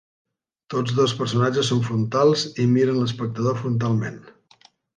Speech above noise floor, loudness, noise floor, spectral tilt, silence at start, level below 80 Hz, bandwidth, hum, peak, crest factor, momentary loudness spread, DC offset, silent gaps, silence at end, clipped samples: 35 dB; -22 LUFS; -56 dBFS; -6 dB/octave; 0.7 s; -60 dBFS; 9.6 kHz; none; -6 dBFS; 16 dB; 7 LU; under 0.1%; none; 0.65 s; under 0.1%